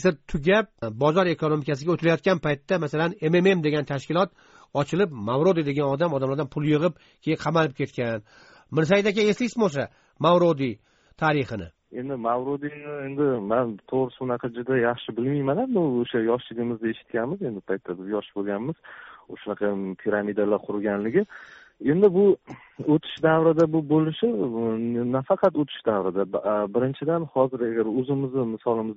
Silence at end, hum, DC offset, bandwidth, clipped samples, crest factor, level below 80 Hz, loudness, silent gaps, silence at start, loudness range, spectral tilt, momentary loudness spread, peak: 0 s; none; under 0.1%; 7.6 kHz; under 0.1%; 18 dB; -56 dBFS; -24 LUFS; none; 0 s; 5 LU; -5.5 dB/octave; 11 LU; -6 dBFS